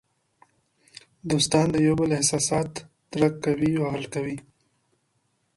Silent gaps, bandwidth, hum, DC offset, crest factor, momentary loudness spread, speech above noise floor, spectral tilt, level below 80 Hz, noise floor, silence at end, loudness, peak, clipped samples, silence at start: none; 11.5 kHz; none; under 0.1%; 20 dB; 14 LU; 48 dB; -4.5 dB/octave; -54 dBFS; -72 dBFS; 1.15 s; -24 LUFS; -6 dBFS; under 0.1%; 1.25 s